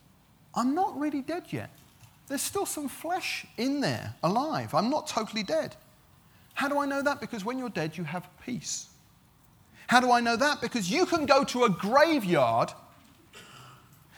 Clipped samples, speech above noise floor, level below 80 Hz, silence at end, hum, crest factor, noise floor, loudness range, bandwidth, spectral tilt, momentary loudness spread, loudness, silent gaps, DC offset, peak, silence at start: under 0.1%; 32 dB; -66 dBFS; 0.4 s; none; 24 dB; -60 dBFS; 8 LU; over 20 kHz; -4 dB/octave; 15 LU; -28 LUFS; none; under 0.1%; -6 dBFS; 0.55 s